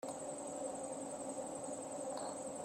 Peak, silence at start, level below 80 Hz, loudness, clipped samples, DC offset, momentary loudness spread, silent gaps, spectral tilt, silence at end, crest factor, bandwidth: -30 dBFS; 0 s; -80 dBFS; -44 LUFS; under 0.1%; under 0.1%; 1 LU; none; -3.5 dB/octave; 0 s; 14 dB; 15.5 kHz